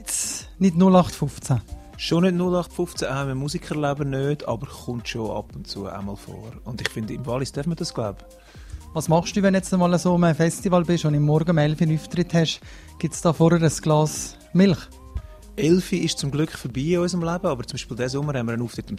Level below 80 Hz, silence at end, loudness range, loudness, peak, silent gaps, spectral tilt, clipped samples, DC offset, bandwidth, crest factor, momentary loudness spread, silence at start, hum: -44 dBFS; 0 s; 9 LU; -23 LUFS; 0 dBFS; none; -6 dB/octave; under 0.1%; under 0.1%; 14.5 kHz; 22 dB; 14 LU; 0 s; none